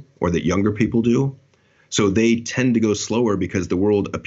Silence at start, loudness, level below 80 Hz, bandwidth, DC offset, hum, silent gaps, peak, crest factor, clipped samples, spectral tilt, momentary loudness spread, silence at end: 0.2 s; -20 LUFS; -48 dBFS; 8 kHz; under 0.1%; none; none; -4 dBFS; 14 dB; under 0.1%; -5.5 dB/octave; 5 LU; 0.05 s